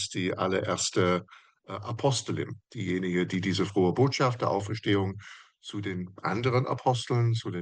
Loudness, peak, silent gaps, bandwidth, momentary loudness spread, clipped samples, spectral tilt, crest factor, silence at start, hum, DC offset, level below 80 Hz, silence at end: -28 LUFS; -12 dBFS; none; 10 kHz; 12 LU; under 0.1%; -5.5 dB/octave; 16 dB; 0 s; none; under 0.1%; -68 dBFS; 0 s